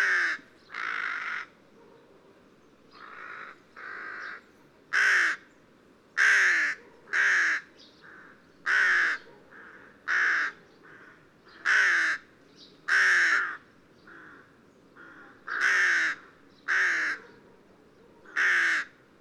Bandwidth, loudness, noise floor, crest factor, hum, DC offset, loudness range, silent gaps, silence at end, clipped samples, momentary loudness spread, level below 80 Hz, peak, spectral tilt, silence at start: 12.5 kHz; -25 LUFS; -59 dBFS; 18 dB; none; under 0.1%; 12 LU; none; 0.3 s; under 0.1%; 20 LU; -78 dBFS; -12 dBFS; 0.5 dB/octave; 0 s